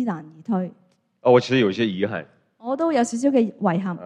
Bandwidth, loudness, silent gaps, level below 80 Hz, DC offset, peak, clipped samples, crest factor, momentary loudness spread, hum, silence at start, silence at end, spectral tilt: 10.5 kHz; -21 LUFS; none; -70 dBFS; under 0.1%; -2 dBFS; under 0.1%; 20 dB; 14 LU; none; 0 s; 0 s; -6 dB/octave